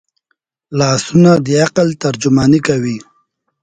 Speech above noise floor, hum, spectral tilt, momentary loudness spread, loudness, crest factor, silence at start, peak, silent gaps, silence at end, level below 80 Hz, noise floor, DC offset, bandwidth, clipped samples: 55 dB; none; -6 dB/octave; 10 LU; -13 LUFS; 14 dB; 0.7 s; 0 dBFS; none; 0.6 s; -46 dBFS; -67 dBFS; under 0.1%; 9.4 kHz; under 0.1%